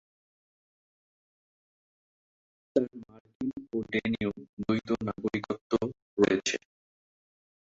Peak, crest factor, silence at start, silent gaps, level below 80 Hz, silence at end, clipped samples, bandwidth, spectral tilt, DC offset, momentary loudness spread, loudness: -10 dBFS; 24 dB; 2.75 s; 3.20-3.25 s, 3.35-3.40 s, 4.49-4.57 s, 5.61-5.70 s, 6.02-6.17 s; -64 dBFS; 1.15 s; under 0.1%; 8 kHz; -5 dB/octave; under 0.1%; 11 LU; -31 LUFS